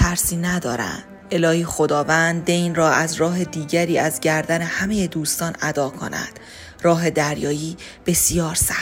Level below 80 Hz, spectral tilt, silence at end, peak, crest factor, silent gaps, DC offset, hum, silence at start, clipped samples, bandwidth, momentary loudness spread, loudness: -38 dBFS; -4 dB/octave; 0 s; -2 dBFS; 18 dB; none; under 0.1%; none; 0 s; under 0.1%; 16 kHz; 10 LU; -20 LUFS